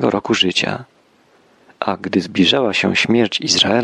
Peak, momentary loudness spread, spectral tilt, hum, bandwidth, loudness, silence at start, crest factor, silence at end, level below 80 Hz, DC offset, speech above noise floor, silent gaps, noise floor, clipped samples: -2 dBFS; 9 LU; -3.5 dB/octave; none; 11.5 kHz; -16 LUFS; 0 s; 16 dB; 0 s; -56 dBFS; under 0.1%; 37 dB; none; -54 dBFS; under 0.1%